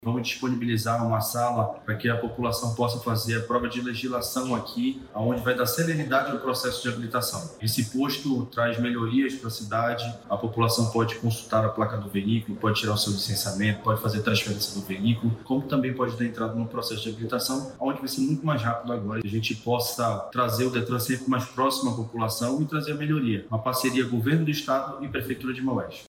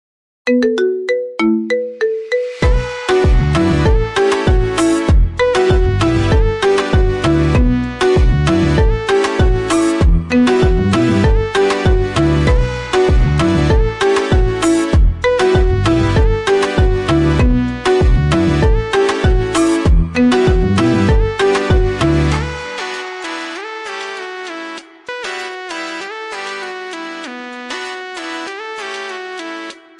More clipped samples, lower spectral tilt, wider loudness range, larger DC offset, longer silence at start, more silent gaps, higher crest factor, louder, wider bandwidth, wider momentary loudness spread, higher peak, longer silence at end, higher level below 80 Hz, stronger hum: neither; second, -5 dB/octave vs -6.5 dB/octave; second, 2 LU vs 11 LU; neither; second, 0 s vs 0.45 s; neither; first, 16 dB vs 10 dB; second, -27 LUFS vs -15 LUFS; first, 17 kHz vs 11.5 kHz; second, 5 LU vs 12 LU; second, -10 dBFS vs -4 dBFS; second, 0 s vs 0.25 s; second, -58 dBFS vs -18 dBFS; neither